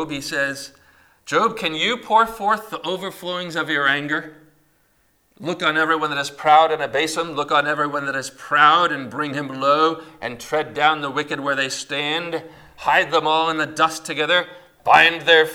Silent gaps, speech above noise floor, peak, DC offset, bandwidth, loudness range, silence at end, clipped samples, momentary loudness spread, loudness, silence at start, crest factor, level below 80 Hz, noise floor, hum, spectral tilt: none; 42 dB; 0 dBFS; under 0.1%; 18 kHz; 4 LU; 0 s; under 0.1%; 13 LU; -19 LUFS; 0 s; 20 dB; -60 dBFS; -62 dBFS; none; -3 dB/octave